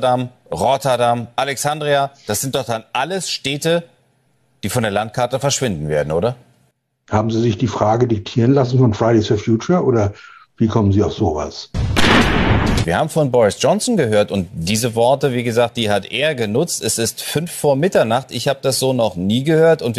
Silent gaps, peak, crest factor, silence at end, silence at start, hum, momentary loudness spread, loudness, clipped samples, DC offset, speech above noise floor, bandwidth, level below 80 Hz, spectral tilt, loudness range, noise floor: none; -2 dBFS; 14 dB; 0 s; 0 s; none; 7 LU; -17 LUFS; under 0.1%; under 0.1%; 44 dB; 13.5 kHz; -34 dBFS; -5 dB/octave; 5 LU; -61 dBFS